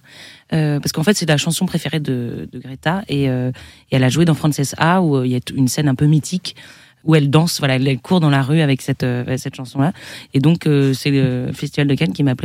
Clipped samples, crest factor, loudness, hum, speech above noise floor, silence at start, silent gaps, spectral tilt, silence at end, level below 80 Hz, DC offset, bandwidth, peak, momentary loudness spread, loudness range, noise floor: under 0.1%; 16 dB; -17 LUFS; none; 25 dB; 0.15 s; none; -6 dB/octave; 0 s; -52 dBFS; under 0.1%; 15.5 kHz; 0 dBFS; 9 LU; 3 LU; -41 dBFS